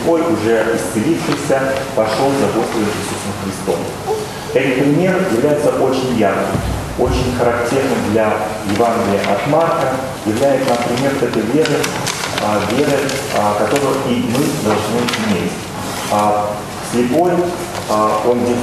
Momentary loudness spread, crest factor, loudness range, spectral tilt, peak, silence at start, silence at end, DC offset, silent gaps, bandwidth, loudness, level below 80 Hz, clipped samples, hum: 6 LU; 16 dB; 2 LU; -5 dB/octave; 0 dBFS; 0 s; 0 s; under 0.1%; none; 13.5 kHz; -16 LUFS; -38 dBFS; under 0.1%; none